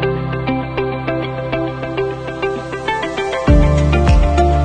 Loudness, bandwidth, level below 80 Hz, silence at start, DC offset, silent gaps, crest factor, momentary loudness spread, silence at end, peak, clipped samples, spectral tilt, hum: -17 LUFS; 9.2 kHz; -20 dBFS; 0 s; under 0.1%; none; 14 dB; 8 LU; 0 s; 0 dBFS; under 0.1%; -7 dB/octave; none